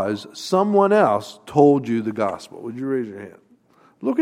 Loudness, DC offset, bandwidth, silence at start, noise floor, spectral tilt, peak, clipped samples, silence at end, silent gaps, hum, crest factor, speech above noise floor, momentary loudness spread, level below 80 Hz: -20 LUFS; under 0.1%; 13.5 kHz; 0 s; -55 dBFS; -6.5 dB/octave; -2 dBFS; under 0.1%; 0 s; none; none; 18 dB; 36 dB; 16 LU; -66 dBFS